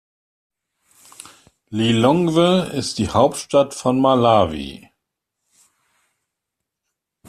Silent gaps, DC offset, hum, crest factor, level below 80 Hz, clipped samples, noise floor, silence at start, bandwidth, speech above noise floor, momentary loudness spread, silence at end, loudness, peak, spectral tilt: none; under 0.1%; none; 18 dB; -52 dBFS; under 0.1%; -81 dBFS; 1.7 s; 14 kHz; 64 dB; 9 LU; 2.55 s; -17 LUFS; -2 dBFS; -5.5 dB/octave